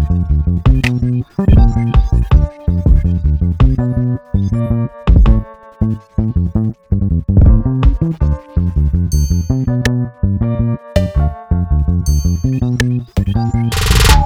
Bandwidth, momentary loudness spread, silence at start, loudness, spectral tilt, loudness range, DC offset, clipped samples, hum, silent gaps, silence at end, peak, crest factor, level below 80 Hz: 15.5 kHz; 7 LU; 0 s; -15 LUFS; -6.5 dB/octave; 2 LU; under 0.1%; under 0.1%; none; none; 0 s; 0 dBFS; 12 dB; -16 dBFS